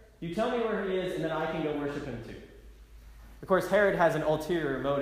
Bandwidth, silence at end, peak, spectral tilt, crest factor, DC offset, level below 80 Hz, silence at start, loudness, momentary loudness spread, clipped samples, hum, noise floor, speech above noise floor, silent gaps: 15.5 kHz; 0 s; -12 dBFS; -6 dB/octave; 18 dB; under 0.1%; -52 dBFS; 0 s; -29 LUFS; 15 LU; under 0.1%; none; -51 dBFS; 22 dB; none